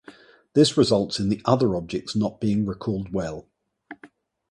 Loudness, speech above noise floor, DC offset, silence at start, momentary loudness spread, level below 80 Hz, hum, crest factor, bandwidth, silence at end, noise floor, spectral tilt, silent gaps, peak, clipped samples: -23 LUFS; 30 dB; under 0.1%; 0.1 s; 10 LU; -52 dBFS; none; 20 dB; 11.5 kHz; 0.45 s; -53 dBFS; -6 dB/octave; none; -4 dBFS; under 0.1%